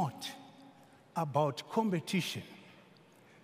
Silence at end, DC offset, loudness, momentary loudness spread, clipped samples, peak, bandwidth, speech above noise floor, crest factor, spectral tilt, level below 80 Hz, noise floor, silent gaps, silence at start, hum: 0.65 s; under 0.1%; -35 LUFS; 20 LU; under 0.1%; -16 dBFS; 15.5 kHz; 27 dB; 20 dB; -5.5 dB/octave; -84 dBFS; -61 dBFS; none; 0 s; none